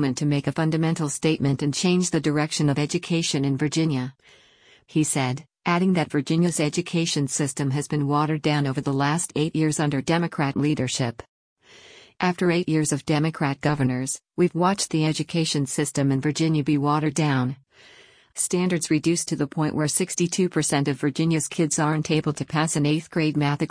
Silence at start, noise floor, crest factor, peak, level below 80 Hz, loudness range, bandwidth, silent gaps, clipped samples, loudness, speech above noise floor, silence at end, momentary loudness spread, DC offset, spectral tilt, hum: 0 s; -56 dBFS; 14 dB; -8 dBFS; -58 dBFS; 2 LU; 10.5 kHz; 11.28-11.56 s; under 0.1%; -23 LUFS; 33 dB; 0 s; 4 LU; under 0.1%; -5 dB/octave; none